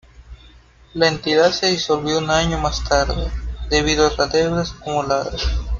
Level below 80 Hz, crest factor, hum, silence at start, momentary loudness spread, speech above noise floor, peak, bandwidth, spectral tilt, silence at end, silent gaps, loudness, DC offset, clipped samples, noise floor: -28 dBFS; 18 dB; none; 0.2 s; 8 LU; 29 dB; -2 dBFS; 7.6 kHz; -4 dB/octave; 0 s; none; -19 LUFS; under 0.1%; under 0.1%; -47 dBFS